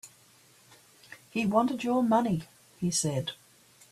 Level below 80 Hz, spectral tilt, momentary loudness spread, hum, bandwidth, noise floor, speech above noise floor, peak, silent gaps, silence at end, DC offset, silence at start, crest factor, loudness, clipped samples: -66 dBFS; -5 dB/octave; 20 LU; none; 14.5 kHz; -60 dBFS; 32 dB; -12 dBFS; none; 0.55 s; under 0.1%; 0.05 s; 18 dB; -29 LUFS; under 0.1%